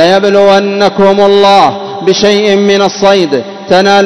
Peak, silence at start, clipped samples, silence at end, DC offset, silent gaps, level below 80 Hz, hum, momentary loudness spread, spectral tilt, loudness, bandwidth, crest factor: 0 dBFS; 0 s; 5%; 0 s; under 0.1%; none; -48 dBFS; none; 6 LU; -4.5 dB/octave; -7 LUFS; 12 kHz; 6 dB